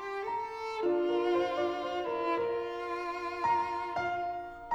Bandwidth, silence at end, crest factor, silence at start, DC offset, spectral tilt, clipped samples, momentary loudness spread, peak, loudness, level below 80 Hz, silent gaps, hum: 8.2 kHz; 0 s; 14 dB; 0 s; under 0.1%; -5 dB/octave; under 0.1%; 7 LU; -18 dBFS; -33 LUFS; -64 dBFS; none; none